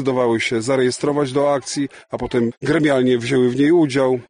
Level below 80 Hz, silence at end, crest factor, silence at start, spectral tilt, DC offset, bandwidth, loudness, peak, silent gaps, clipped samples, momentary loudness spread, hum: -50 dBFS; 0.05 s; 12 dB; 0 s; -5.5 dB/octave; under 0.1%; 10 kHz; -18 LUFS; -6 dBFS; 2.57-2.61 s; under 0.1%; 8 LU; none